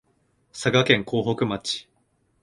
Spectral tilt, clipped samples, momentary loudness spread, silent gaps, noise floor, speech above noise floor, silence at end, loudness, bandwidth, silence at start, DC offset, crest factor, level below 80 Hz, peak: -4.5 dB/octave; under 0.1%; 12 LU; none; -67 dBFS; 45 dB; 0.6 s; -23 LUFS; 11.5 kHz; 0.55 s; under 0.1%; 24 dB; -58 dBFS; -2 dBFS